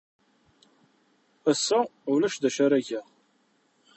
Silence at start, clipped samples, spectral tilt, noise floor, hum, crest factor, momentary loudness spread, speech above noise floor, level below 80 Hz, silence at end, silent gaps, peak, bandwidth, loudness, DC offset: 1.45 s; under 0.1%; -3.5 dB/octave; -68 dBFS; none; 18 dB; 8 LU; 43 dB; -78 dBFS; 0.95 s; none; -10 dBFS; 8.4 kHz; -26 LUFS; under 0.1%